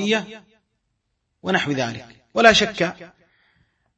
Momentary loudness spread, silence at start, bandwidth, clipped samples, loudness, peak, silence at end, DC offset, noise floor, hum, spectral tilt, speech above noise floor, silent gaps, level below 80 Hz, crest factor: 19 LU; 0 s; 8.6 kHz; under 0.1%; -19 LUFS; 0 dBFS; 0.9 s; under 0.1%; -74 dBFS; none; -3.5 dB/octave; 53 dB; none; -54 dBFS; 22 dB